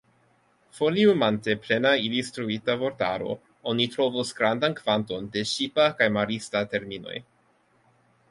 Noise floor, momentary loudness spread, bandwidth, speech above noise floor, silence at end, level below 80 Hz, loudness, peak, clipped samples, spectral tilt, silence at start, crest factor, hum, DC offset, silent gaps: -65 dBFS; 10 LU; 11.5 kHz; 39 dB; 1.1 s; -64 dBFS; -25 LUFS; -4 dBFS; under 0.1%; -4.5 dB/octave; 0.75 s; 22 dB; none; under 0.1%; none